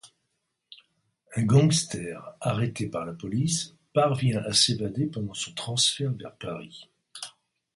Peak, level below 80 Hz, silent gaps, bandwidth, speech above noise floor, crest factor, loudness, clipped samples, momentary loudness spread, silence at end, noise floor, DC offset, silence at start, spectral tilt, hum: -6 dBFS; -60 dBFS; none; 11.5 kHz; 52 dB; 22 dB; -26 LUFS; under 0.1%; 18 LU; 0.45 s; -79 dBFS; under 0.1%; 0.05 s; -4.5 dB/octave; none